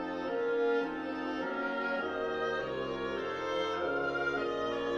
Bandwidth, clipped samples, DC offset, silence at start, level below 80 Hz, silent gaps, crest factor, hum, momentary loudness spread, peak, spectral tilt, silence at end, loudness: 7.4 kHz; under 0.1%; under 0.1%; 0 s; -62 dBFS; none; 12 dB; none; 4 LU; -22 dBFS; -5 dB/octave; 0 s; -34 LUFS